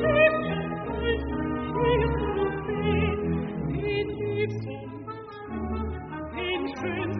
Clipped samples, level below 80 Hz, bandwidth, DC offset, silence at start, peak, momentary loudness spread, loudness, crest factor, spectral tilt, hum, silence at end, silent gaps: under 0.1%; -40 dBFS; 4.9 kHz; under 0.1%; 0 s; -8 dBFS; 12 LU; -28 LUFS; 20 dB; -5 dB/octave; none; 0 s; none